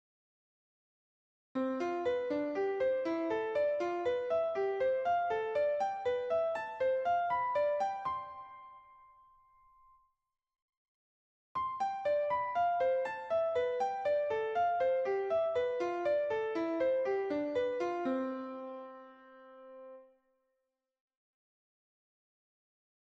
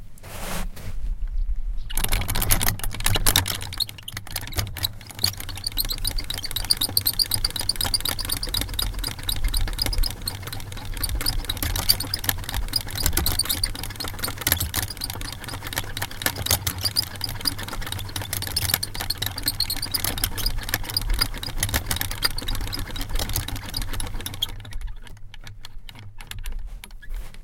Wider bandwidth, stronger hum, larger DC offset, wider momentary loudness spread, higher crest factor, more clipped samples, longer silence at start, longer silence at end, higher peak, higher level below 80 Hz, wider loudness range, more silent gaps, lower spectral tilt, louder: second, 7.8 kHz vs 17 kHz; neither; neither; second, 11 LU vs 15 LU; second, 14 dB vs 26 dB; neither; first, 1.55 s vs 0 s; first, 3 s vs 0 s; second, -22 dBFS vs 0 dBFS; second, -74 dBFS vs -30 dBFS; first, 10 LU vs 5 LU; first, 10.62-11.55 s vs none; first, -5.5 dB/octave vs -2 dB/octave; second, -34 LUFS vs -25 LUFS